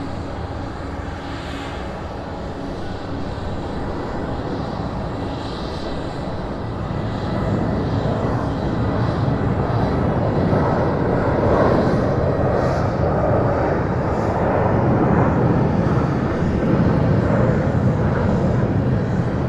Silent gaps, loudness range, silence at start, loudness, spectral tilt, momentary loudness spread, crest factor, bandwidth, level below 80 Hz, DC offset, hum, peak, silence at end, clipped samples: none; 9 LU; 0 s; -20 LUFS; -8.5 dB/octave; 11 LU; 16 dB; 8.8 kHz; -32 dBFS; under 0.1%; none; -4 dBFS; 0 s; under 0.1%